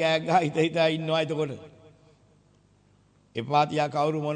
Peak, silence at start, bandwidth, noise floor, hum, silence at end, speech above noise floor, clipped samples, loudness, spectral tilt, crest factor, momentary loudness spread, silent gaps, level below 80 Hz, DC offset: -10 dBFS; 0 s; 9.4 kHz; -62 dBFS; 50 Hz at -55 dBFS; 0 s; 36 dB; under 0.1%; -25 LUFS; -6 dB/octave; 18 dB; 12 LU; none; -70 dBFS; under 0.1%